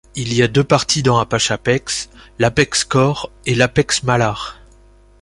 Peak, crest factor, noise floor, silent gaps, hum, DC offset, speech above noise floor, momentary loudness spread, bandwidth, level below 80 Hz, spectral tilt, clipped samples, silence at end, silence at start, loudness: 0 dBFS; 16 dB; -47 dBFS; none; none; under 0.1%; 31 dB; 9 LU; 11.5 kHz; -42 dBFS; -4 dB/octave; under 0.1%; 0.7 s; 0.15 s; -16 LUFS